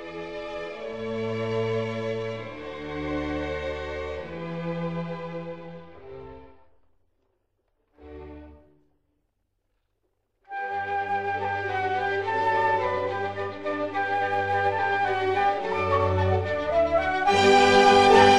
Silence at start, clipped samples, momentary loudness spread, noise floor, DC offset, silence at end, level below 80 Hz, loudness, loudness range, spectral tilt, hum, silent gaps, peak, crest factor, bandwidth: 0 s; under 0.1%; 18 LU; -75 dBFS; 0.3%; 0 s; -50 dBFS; -25 LUFS; 17 LU; -5 dB/octave; none; none; -4 dBFS; 22 dB; 11.5 kHz